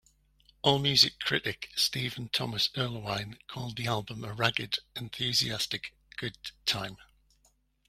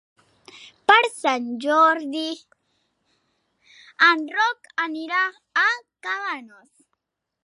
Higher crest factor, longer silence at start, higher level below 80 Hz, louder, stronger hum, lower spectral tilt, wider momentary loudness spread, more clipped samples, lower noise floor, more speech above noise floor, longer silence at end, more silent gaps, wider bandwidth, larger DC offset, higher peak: first, 28 dB vs 22 dB; about the same, 0.65 s vs 0.55 s; first, -62 dBFS vs -80 dBFS; second, -29 LUFS vs -21 LUFS; neither; first, -3 dB/octave vs -1.5 dB/octave; about the same, 15 LU vs 13 LU; neither; second, -69 dBFS vs -78 dBFS; second, 38 dB vs 56 dB; about the same, 0.85 s vs 0.95 s; neither; first, 16 kHz vs 11.5 kHz; neither; second, -6 dBFS vs -2 dBFS